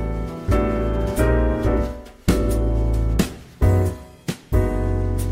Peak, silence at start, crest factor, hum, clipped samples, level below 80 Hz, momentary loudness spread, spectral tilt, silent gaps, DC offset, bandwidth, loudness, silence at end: -2 dBFS; 0 s; 18 dB; none; under 0.1%; -24 dBFS; 8 LU; -7 dB/octave; none; under 0.1%; 16 kHz; -22 LUFS; 0 s